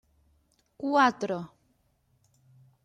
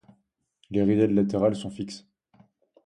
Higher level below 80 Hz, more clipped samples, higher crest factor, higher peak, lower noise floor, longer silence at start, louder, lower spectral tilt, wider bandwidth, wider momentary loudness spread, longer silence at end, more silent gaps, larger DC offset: second, -72 dBFS vs -58 dBFS; neither; about the same, 22 dB vs 18 dB; about the same, -10 dBFS vs -10 dBFS; about the same, -70 dBFS vs -71 dBFS; about the same, 0.8 s vs 0.7 s; about the same, -27 LUFS vs -25 LUFS; second, -5 dB/octave vs -7.5 dB/octave; about the same, 10 kHz vs 10.5 kHz; about the same, 14 LU vs 15 LU; first, 1.4 s vs 0.9 s; neither; neither